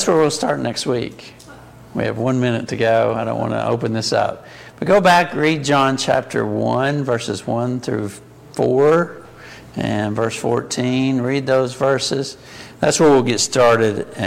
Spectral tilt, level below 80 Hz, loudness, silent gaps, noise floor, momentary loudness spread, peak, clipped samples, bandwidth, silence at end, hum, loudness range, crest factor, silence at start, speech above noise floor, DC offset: -5 dB/octave; -52 dBFS; -18 LUFS; none; -40 dBFS; 15 LU; -2 dBFS; under 0.1%; 16 kHz; 0 s; none; 3 LU; 16 dB; 0 s; 23 dB; under 0.1%